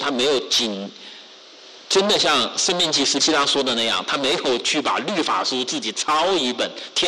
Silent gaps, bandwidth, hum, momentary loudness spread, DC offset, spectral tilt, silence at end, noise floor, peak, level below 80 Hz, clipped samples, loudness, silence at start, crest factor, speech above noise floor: none; 13 kHz; none; 7 LU; under 0.1%; -1.5 dB/octave; 0 s; -44 dBFS; -10 dBFS; -60 dBFS; under 0.1%; -19 LUFS; 0 s; 12 dB; 23 dB